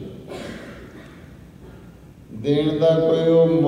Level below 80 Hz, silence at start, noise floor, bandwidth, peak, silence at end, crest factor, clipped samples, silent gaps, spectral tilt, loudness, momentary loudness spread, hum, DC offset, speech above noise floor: -50 dBFS; 0 s; -44 dBFS; 10.5 kHz; -6 dBFS; 0 s; 16 dB; under 0.1%; none; -8 dB/octave; -18 LUFS; 25 LU; none; under 0.1%; 27 dB